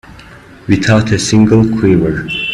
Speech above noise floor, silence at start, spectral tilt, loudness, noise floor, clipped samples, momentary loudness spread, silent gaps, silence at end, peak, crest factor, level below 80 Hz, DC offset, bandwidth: 26 dB; 0.1 s; -6 dB/octave; -11 LUFS; -36 dBFS; under 0.1%; 7 LU; none; 0 s; 0 dBFS; 12 dB; -34 dBFS; under 0.1%; 11.5 kHz